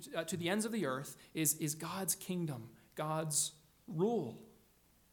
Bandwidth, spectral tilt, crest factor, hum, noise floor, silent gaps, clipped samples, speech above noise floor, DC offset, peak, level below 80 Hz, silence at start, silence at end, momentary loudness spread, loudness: 19 kHz; -4 dB/octave; 20 dB; none; -69 dBFS; none; under 0.1%; 31 dB; under 0.1%; -20 dBFS; -76 dBFS; 0 s; 0.6 s; 12 LU; -37 LUFS